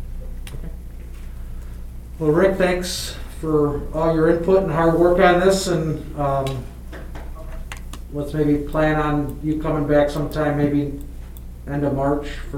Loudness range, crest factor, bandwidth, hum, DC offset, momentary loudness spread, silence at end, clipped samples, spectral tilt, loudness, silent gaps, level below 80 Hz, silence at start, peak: 6 LU; 18 dB; 16.5 kHz; 60 Hz at -35 dBFS; under 0.1%; 20 LU; 0 s; under 0.1%; -6 dB/octave; -20 LUFS; none; -32 dBFS; 0 s; -2 dBFS